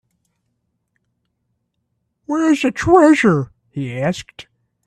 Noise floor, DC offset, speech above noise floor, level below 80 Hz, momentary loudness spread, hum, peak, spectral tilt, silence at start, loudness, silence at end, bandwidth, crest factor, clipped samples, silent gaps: -71 dBFS; under 0.1%; 57 dB; -48 dBFS; 18 LU; none; 0 dBFS; -6 dB/octave; 2.3 s; -15 LUFS; 0.45 s; 11 kHz; 18 dB; under 0.1%; none